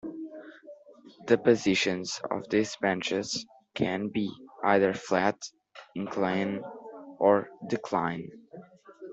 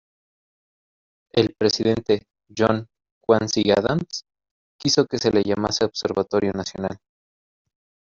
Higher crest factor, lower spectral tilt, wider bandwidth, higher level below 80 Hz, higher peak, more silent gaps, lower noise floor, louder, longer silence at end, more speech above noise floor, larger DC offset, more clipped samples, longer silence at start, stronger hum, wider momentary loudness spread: about the same, 22 dB vs 20 dB; about the same, -4.5 dB/octave vs -4.5 dB/octave; about the same, 8.2 kHz vs 7.6 kHz; second, -68 dBFS vs -56 dBFS; second, -8 dBFS vs -4 dBFS; second, none vs 3.11-3.21 s, 4.51-4.79 s; second, -53 dBFS vs under -90 dBFS; second, -28 LUFS vs -22 LUFS; second, 0 s vs 1.2 s; second, 25 dB vs over 69 dB; neither; neither; second, 0.05 s vs 1.35 s; neither; first, 20 LU vs 11 LU